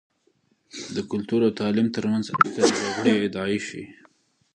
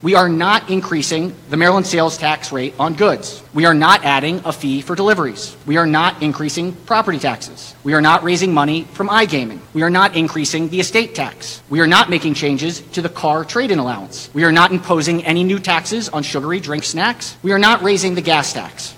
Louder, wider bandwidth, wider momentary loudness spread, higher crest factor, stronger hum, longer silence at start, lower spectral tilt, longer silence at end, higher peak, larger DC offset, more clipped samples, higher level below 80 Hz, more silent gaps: second, -23 LUFS vs -15 LUFS; second, 10 kHz vs 17 kHz; first, 16 LU vs 11 LU; first, 24 dB vs 16 dB; neither; first, 0.75 s vs 0 s; about the same, -5 dB/octave vs -4 dB/octave; first, 0.65 s vs 0 s; about the same, 0 dBFS vs 0 dBFS; neither; neither; second, -62 dBFS vs -54 dBFS; neither